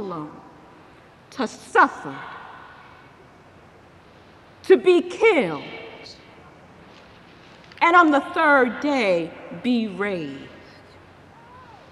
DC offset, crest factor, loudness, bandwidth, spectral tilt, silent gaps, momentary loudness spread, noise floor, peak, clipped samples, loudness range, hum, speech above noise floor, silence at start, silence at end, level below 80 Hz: under 0.1%; 20 dB; -20 LUFS; 11.5 kHz; -5 dB/octave; none; 24 LU; -49 dBFS; -4 dBFS; under 0.1%; 7 LU; none; 29 dB; 0 s; 1.45 s; -64 dBFS